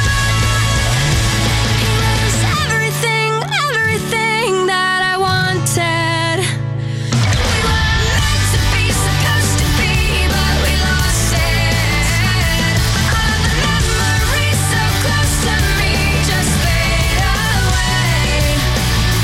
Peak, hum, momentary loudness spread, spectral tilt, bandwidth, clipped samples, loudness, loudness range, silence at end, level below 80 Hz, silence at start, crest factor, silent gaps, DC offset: -2 dBFS; none; 1 LU; -4 dB/octave; 16.5 kHz; under 0.1%; -14 LUFS; 1 LU; 0 s; -22 dBFS; 0 s; 12 dB; none; under 0.1%